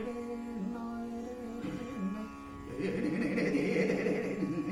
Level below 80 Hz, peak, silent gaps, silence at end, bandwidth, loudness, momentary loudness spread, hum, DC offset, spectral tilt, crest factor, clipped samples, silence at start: -58 dBFS; -18 dBFS; none; 0 s; 13.5 kHz; -35 LUFS; 11 LU; none; under 0.1%; -7 dB/octave; 16 dB; under 0.1%; 0 s